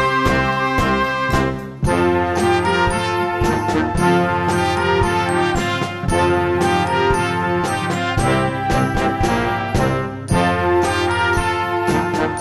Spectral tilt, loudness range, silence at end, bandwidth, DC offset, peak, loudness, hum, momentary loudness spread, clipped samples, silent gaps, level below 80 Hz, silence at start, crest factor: -5.5 dB/octave; 1 LU; 0 s; 15 kHz; under 0.1%; -2 dBFS; -18 LUFS; none; 3 LU; under 0.1%; none; -32 dBFS; 0 s; 16 dB